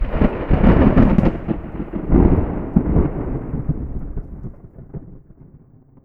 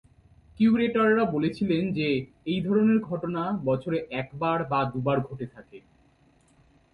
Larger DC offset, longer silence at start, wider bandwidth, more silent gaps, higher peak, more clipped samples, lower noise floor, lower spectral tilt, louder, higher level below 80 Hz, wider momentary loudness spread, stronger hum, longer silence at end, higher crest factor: neither; second, 0 s vs 0.6 s; second, 4.4 kHz vs 5.2 kHz; neither; first, 0 dBFS vs -12 dBFS; neither; second, -47 dBFS vs -62 dBFS; first, -11 dB/octave vs -8.5 dB/octave; first, -18 LUFS vs -26 LUFS; first, -22 dBFS vs -58 dBFS; first, 22 LU vs 9 LU; neither; second, 0.5 s vs 1.15 s; about the same, 18 dB vs 14 dB